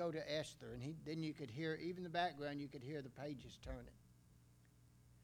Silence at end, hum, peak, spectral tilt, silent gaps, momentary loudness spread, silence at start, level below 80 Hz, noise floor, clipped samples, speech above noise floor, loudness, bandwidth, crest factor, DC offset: 0 s; none; -26 dBFS; -5.5 dB/octave; none; 11 LU; 0 s; -66 dBFS; -69 dBFS; under 0.1%; 22 dB; -47 LUFS; 19.5 kHz; 22 dB; under 0.1%